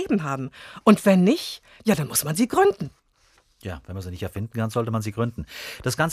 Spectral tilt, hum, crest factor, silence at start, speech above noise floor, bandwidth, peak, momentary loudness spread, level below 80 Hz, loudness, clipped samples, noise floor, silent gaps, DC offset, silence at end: -5.5 dB/octave; none; 20 dB; 0 s; 38 dB; 15.5 kHz; -4 dBFS; 17 LU; -54 dBFS; -23 LUFS; under 0.1%; -61 dBFS; none; under 0.1%; 0 s